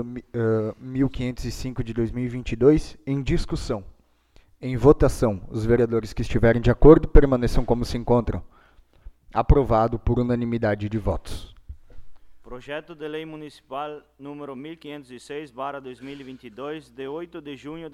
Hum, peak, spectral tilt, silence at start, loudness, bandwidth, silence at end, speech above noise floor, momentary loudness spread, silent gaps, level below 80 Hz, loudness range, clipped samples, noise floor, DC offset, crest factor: none; 0 dBFS; -7.5 dB/octave; 0 s; -23 LUFS; 12.5 kHz; 0.05 s; 34 dB; 19 LU; none; -30 dBFS; 16 LU; under 0.1%; -56 dBFS; under 0.1%; 22 dB